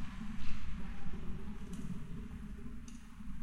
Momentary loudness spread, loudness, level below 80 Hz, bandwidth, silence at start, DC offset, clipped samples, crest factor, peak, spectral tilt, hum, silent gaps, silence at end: 6 LU; -47 LUFS; -46 dBFS; 9.2 kHz; 0 s; under 0.1%; under 0.1%; 16 dB; -20 dBFS; -6.5 dB/octave; none; none; 0 s